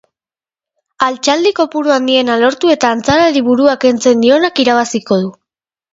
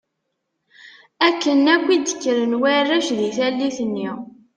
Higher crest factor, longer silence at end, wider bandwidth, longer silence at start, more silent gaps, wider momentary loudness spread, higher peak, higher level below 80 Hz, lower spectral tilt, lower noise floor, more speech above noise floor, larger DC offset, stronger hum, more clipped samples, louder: second, 12 dB vs 18 dB; first, 0.6 s vs 0.3 s; second, 8 kHz vs 10 kHz; first, 1 s vs 0.85 s; neither; second, 5 LU vs 9 LU; about the same, 0 dBFS vs -2 dBFS; first, -50 dBFS vs -68 dBFS; about the same, -4 dB/octave vs -3 dB/octave; first, under -90 dBFS vs -76 dBFS; first, over 79 dB vs 57 dB; neither; neither; neither; first, -12 LUFS vs -19 LUFS